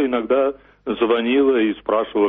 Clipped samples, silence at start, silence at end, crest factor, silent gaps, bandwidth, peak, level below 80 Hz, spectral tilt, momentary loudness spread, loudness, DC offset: under 0.1%; 0 s; 0 s; 14 dB; none; 4 kHz; -6 dBFS; -54 dBFS; -3 dB/octave; 8 LU; -19 LUFS; under 0.1%